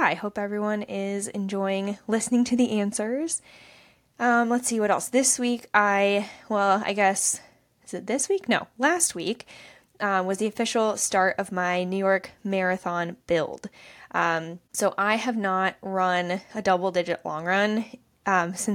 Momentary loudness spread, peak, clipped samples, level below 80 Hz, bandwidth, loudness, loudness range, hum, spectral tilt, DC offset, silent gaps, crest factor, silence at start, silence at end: 9 LU; -4 dBFS; under 0.1%; -66 dBFS; 17.5 kHz; -25 LUFS; 4 LU; none; -3.5 dB/octave; under 0.1%; none; 22 dB; 0 s; 0 s